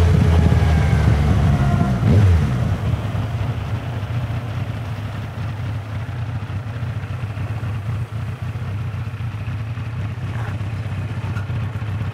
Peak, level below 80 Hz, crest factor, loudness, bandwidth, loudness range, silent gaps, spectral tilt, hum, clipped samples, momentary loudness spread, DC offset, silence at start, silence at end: -2 dBFS; -30 dBFS; 16 dB; -21 LUFS; 11.5 kHz; 9 LU; none; -8 dB/octave; none; under 0.1%; 12 LU; under 0.1%; 0 s; 0 s